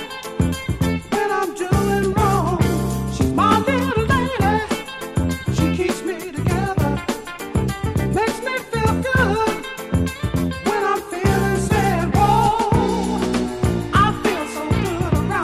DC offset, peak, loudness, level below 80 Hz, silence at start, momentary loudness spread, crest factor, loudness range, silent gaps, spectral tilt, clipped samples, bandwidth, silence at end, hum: under 0.1%; -2 dBFS; -20 LUFS; -32 dBFS; 0 s; 7 LU; 16 dB; 3 LU; none; -6 dB/octave; under 0.1%; 15.5 kHz; 0 s; none